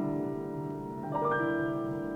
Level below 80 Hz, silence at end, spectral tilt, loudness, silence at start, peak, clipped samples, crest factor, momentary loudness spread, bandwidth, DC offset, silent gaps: -60 dBFS; 0 s; -8.5 dB/octave; -33 LUFS; 0 s; -18 dBFS; under 0.1%; 14 dB; 8 LU; 12 kHz; under 0.1%; none